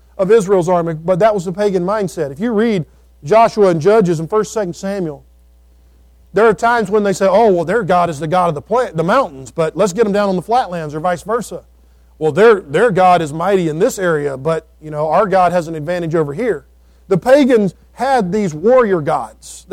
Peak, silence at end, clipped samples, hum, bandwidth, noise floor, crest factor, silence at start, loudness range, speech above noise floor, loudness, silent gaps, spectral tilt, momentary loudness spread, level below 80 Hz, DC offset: 0 dBFS; 0.15 s; under 0.1%; none; 15.5 kHz; -47 dBFS; 14 dB; 0.2 s; 2 LU; 33 dB; -15 LUFS; none; -6 dB/octave; 10 LU; -46 dBFS; under 0.1%